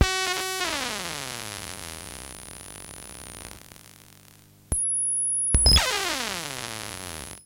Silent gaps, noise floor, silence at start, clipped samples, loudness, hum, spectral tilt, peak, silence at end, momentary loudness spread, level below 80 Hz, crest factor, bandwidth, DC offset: none; -53 dBFS; 0 s; under 0.1%; -24 LUFS; 50 Hz at -55 dBFS; -1.5 dB/octave; -4 dBFS; 0.05 s; 21 LU; -36 dBFS; 24 dB; 17 kHz; under 0.1%